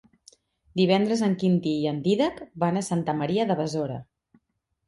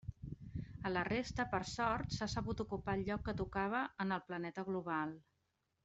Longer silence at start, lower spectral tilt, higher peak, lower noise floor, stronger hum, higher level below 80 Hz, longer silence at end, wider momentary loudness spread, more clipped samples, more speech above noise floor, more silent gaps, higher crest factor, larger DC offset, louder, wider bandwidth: first, 0.75 s vs 0.05 s; about the same, -6.5 dB/octave vs -5.5 dB/octave; first, -8 dBFS vs -22 dBFS; second, -73 dBFS vs -83 dBFS; neither; second, -64 dBFS vs -56 dBFS; first, 0.85 s vs 0.65 s; about the same, 8 LU vs 10 LU; neither; first, 49 dB vs 44 dB; neither; about the same, 18 dB vs 20 dB; neither; first, -25 LUFS vs -40 LUFS; first, 11.5 kHz vs 8.2 kHz